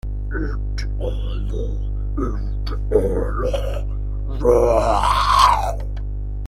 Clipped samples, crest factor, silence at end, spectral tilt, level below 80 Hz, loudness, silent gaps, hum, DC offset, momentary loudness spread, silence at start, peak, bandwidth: under 0.1%; 18 dB; 0 s; -5.5 dB/octave; -24 dBFS; -21 LUFS; none; 50 Hz at -25 dBFS; under 0.1%; 12 LU; 0.05 s; -2 dBFS; 13.5 kHz